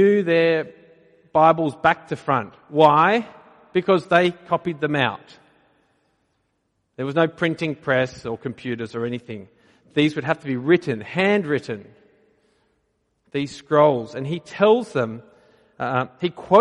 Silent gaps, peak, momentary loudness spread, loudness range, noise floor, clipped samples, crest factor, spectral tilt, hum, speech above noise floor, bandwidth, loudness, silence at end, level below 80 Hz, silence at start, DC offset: none; -2 dBFS; 13 LU; 6 LU; -71 dBFS; under 0.1%; 20 dB; -6.5 dB/octave; none; 51 dB; 11 kHz; -21 LUFS; 0 s; -62 dBFS; 0 s; under 0.1%